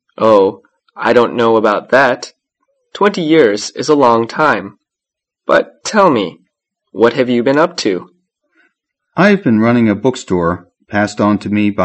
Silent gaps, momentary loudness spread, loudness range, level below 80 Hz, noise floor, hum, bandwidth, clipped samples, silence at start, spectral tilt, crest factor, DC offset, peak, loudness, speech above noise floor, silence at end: none; 11 LU; 2 LU; -52 dBFS; -83 dBFS; none; 8.8 kHz; 0.2%; 0.2 s; -5.5 dB/octave; 14 dB; under 0.1%; 0 dBFS; -13 LUFS; 71 dB; 0 s